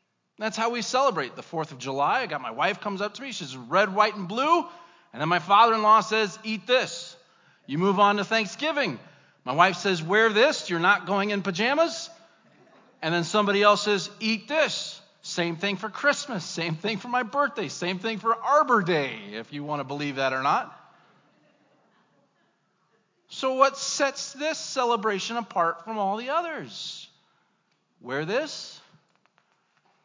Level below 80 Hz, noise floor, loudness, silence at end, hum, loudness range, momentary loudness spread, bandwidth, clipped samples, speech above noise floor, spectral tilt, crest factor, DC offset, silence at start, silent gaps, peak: -88 dBFS; -71 dBFS; -25 LUFS; 1.25 s; none; 8 LU; 14 LU; 7.6 kHz; under 0.1%; 46 dB; -4 dB/octave; 22 dB; under 0.1%; 0.4 s; none; -4 dBFS